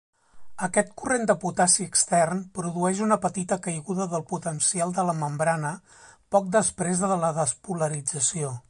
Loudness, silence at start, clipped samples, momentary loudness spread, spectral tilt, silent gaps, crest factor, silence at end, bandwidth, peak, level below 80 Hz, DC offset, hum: -25 LUFS; 0.35 s; under 0.1%; 9 LU; -4 dB/octave; none; 20 dB; 0.1 s; 11.5 kHz; -6 dBFS; -62 dBFS; under 0.1%; none